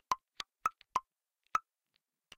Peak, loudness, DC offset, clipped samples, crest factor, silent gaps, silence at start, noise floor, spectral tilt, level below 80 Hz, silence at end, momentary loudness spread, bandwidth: -16 dBFS; -39 LUFS; under 0.1%; under 0.1%; 26 dB; none; 0.1 s; -83 dBFS; -1 dB/octave; -74 dBFS; 0.75 s; 2 LU; 15.5 kHz